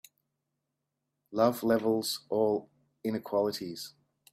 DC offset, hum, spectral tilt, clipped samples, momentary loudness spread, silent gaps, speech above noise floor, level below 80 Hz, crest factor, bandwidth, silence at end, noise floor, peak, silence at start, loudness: under 0.1%; none; -5 dB/octave; under 0.1%; 12 LU; none; 55 dB; -74 dBFS; 20 dB; 16 kHz; 0.45 s; -84 dBFS; -12 dBFS; 1.3 s; -31 LUFS